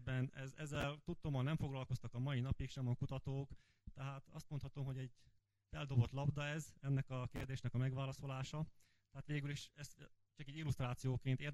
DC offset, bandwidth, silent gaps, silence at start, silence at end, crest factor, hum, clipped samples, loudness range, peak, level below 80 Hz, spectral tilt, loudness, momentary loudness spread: under 0.1%; 12.5 kHz; none; 0 s; 0 s; 20 dB; none; under 0.1%; 4 LU; -24 dBFS; -60 dBFS; -6.5 dB/octave; -44 LUFS; 13 LU